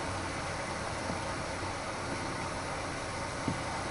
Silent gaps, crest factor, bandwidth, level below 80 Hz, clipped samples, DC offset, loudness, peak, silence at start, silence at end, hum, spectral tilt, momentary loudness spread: none; 18 dB; 11.5 kHz; -50 dBFS; under 0.1%; under 0.1%; -36 LUFS; -18 dBFS; 0 s; 0 s; none; -4 dB/octave; 2 LU